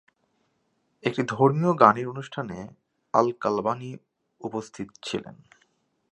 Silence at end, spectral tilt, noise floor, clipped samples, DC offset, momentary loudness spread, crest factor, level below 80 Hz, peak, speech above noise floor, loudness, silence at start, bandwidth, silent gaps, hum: 0.8 s; -6.5 dB/octave; -72 dBFS; under 0.1%; under 0.1%; 20 LU; 26 dB; -66 dBFS; -2 dBFS; 47 dB; -25 LUFS; 1.05 s; 11 kHz; none; none